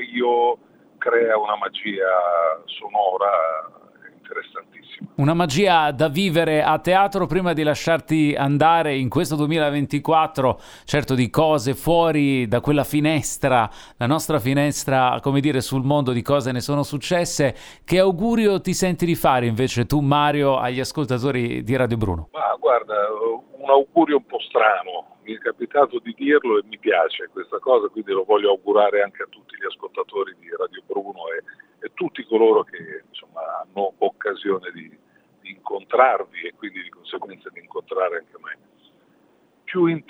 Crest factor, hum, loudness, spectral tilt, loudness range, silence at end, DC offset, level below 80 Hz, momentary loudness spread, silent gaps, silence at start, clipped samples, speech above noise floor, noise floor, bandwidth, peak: 20 dB; none; -20 LUFS; -5.5 dB/octave; 5 LU; 0.1 s; under 0.1%; -48 dBFS; 15 LU; none; 0 s; under 0.1%; 38 dB; -59 dBFS; over 20 kHz; -2 dBFS